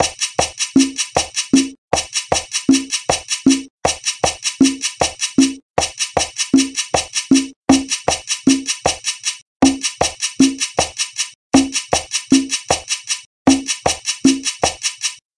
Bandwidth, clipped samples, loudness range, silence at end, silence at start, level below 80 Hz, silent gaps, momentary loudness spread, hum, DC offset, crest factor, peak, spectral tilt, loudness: 11.5 kHz; under 0.1%; 1 LU; 0.25 s; 0 s; -44 dBFS; 1.78-1.89 s, 3.70-3.79 s, 5.62-5.75 s, 7.56-7.64 s, 9.42-9.60 s, 11.35-11.51 s, 13.26-13.45 s; 5 LU; none; under 0.1%; 18 dB; 0 dBFS; -2.5 dB/octave; -17 LUFS